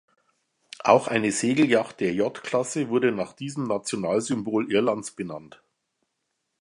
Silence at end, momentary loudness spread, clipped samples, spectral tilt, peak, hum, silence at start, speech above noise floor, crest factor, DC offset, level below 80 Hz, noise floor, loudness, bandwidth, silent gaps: 1.15 s; 11 LU; under 0.1%; -4.5 dB/octave; -2 dBFS; none; 0.85 s; 54 dB; 24 dB; under 0.1%; -66 dBFS; -78 dBFS; -24 LUFS; 11.5 kHz; none